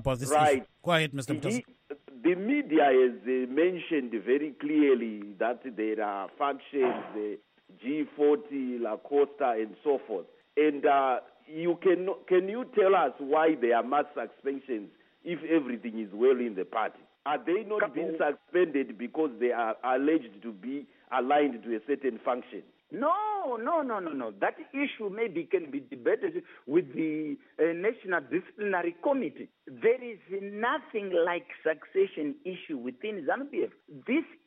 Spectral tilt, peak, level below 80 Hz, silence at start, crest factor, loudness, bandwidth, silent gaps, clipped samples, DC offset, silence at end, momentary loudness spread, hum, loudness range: -5.5 dB/octave; -12 dBFS; -66 dBFS; 0 s; 18 dB; -30 LUFS; 8.2 kHz; none; under 0.1%; under 0.1%; 0.15 s; 12 LU; none; 5 LU